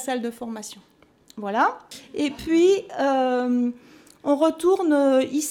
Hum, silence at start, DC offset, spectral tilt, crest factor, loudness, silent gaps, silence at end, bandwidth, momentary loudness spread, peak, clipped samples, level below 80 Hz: none; 0 s; under 0.1%; -4 dB/octave; 14 dB; -22 LUFS; none; 0 s; 17.5 kHz; 15 LU; -8 dBFS; under 0.1%; -60 dBFS